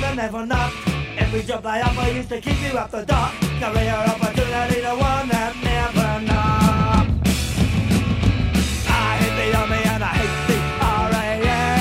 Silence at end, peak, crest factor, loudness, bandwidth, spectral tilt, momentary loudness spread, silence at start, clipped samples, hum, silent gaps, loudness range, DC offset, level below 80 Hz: 0 s; -4 dBFS; 16 dB; -20 LUFS; 16 kHz; -5.5 dB/octave; 5 LU; 0 s; under 0.1%; none; none; 3 LU; under 0.1%; -28 dBFS